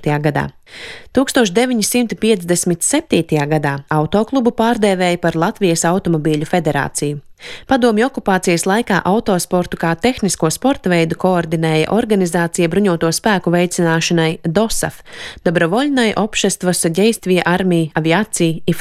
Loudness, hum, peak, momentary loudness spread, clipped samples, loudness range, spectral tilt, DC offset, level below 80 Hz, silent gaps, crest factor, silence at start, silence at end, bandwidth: -15 LUFS; none; 0 dBFS; 4 LU; under 0.1%; 1 LU; -4.5 dB/octave; under 0.1%; -42 dBFS; none; 16 dB; 0 s; 0 s; 15.5 kHz